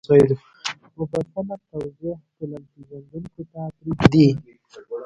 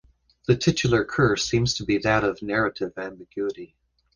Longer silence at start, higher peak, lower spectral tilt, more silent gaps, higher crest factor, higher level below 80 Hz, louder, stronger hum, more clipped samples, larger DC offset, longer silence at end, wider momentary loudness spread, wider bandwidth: second, 0.1 s vs 0.5 s; first, 0 dBFS vs -6 dBFS; first, -7.5 dB/octave vs -5 dB/octave; neither; about the same, 22 dB vs 20 dB; about the same, -48 dBFS vs -48 dBFS; about the same, -21 LUFS vs -23 LUFS; neither; neither; neither; second, 0 s vs 0.5 s; first, 21 LU vs 13 LU; about the same, 10.5 kHz vs 10 kHz